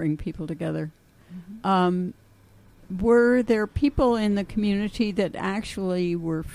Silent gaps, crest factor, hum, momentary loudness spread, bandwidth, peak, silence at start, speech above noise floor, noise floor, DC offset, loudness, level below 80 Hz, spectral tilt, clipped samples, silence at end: none; 18 dB; none; 14 LU; 12 kHz; -8 dBFS; 0 s; 30 dB; -54 dBFS; under 0.1%; -24 LUFS; -42 dBFS; -7 dB/octave; under 0.1%; 0 s